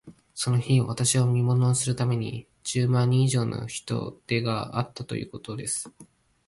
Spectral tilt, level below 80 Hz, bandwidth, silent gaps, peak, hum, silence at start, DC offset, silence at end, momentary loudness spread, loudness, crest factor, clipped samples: -5 dB/octave; -58 dBFS; 11.5 kHz; none; -10 dBFS; none; 0.05 s; under 0.1%; 0.45 s; 12 LU; -26 LUFS; 16 dB; under 0.1%